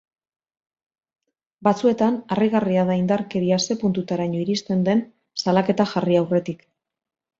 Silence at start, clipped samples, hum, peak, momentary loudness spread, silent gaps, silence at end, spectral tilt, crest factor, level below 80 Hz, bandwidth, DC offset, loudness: 1.6 s; under 0.1%; none; -4 dBFS; 5 LU; none; 0.85 s; -6 dB/octave; 18 dB; -62 dBFS; 7.6 kHz; under 0.1%; -21 LUFS